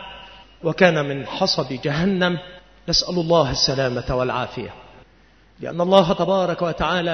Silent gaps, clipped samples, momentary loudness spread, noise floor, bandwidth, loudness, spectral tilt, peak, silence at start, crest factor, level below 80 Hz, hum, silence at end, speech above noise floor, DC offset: none; under 0.1%; 14 LU; -53 dBFS; 6.6 kHz; -20 LUFS; -5 dB/octave; 0 dBFS; 0 s; 22 dB; -44 dBFS; none; 0 s; 33 dB; 0.1%